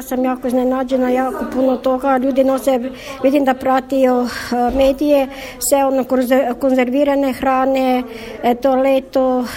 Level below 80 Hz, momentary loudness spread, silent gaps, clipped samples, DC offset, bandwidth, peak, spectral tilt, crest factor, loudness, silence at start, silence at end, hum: -42 dBFS; 5 LU; none; under 0.1%; under 0.1%; 16.5 kHz; -2 dBFS; -4 dB/octave; 14 dB; -16 LUFS; 0 s; 0 s; none